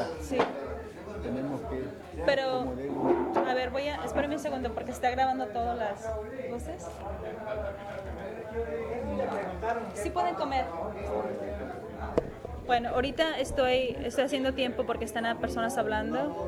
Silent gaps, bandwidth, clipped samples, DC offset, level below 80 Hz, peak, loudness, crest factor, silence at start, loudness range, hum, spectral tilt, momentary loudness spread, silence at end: none; 16 kHz; under 0.1%; under 0.1%; -46 dBFS; -10 dBFS; -32 LUFS; 22 dB; 0 s; 6 LU; none; -5 dB/octave; 11 LU; 0 s